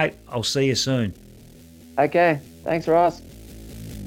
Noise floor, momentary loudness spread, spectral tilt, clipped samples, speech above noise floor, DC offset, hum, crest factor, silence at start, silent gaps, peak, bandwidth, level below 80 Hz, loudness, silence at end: -46 dBFS; 22 LU; -4.5 dB/octave; under 0.1%; 25 dB; under 0.1%; none; 16 dB; 0 s; none; -6 dBFS; 17 kHz; -48 dBFS; -22 LUFS; 0 s